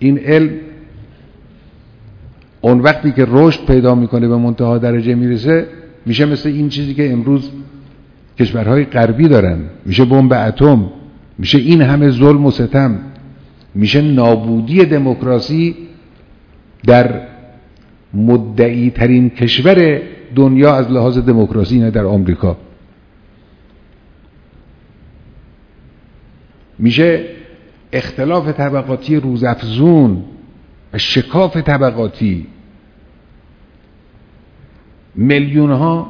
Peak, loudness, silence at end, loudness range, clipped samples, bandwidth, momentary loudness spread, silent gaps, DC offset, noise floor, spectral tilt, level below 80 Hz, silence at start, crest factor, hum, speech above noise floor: 0 dBFS; -12 LUFS; 0 s; 8 LU; 0.5%; 5.4 kHz; 11 LU; none; under 0.1%; -45 dBFS; -8.5 dB/octave; -36 dBFS; 0 s; 12 dB; none; 34 dB